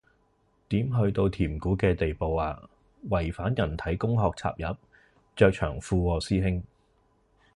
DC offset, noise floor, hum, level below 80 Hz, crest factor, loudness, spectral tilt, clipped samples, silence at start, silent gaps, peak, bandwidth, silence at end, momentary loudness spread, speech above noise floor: under 0.1%; -67 dBFS; none; -40 dBFS; 22 dB; -28 LUFS; -7.5 dB/octave; under 0.1%; 0.7 s; none; -6 dBFS; 11 kHz; 0.9 s; 11 LU; 41 dB